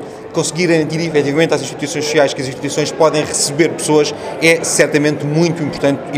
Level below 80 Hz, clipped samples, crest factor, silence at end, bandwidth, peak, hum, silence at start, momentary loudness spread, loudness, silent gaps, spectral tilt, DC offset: -54 dBFS; under 0.1%; 14 dB; 0 s; 16 kHz; 0 dBFS; none; 0 s; 7 LU; -15 LUFS; none; -4 dB/octave; under 0.1%